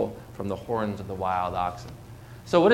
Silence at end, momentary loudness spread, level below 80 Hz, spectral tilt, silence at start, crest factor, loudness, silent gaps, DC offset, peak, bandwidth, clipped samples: 0 s; 18 LU; -52 dBFS; -6.5 dB/octave; 0 s; 20 dB; -29 LUFS; none; under 0.1%; -6 dBFS; 16.5 kHz; under 0.1%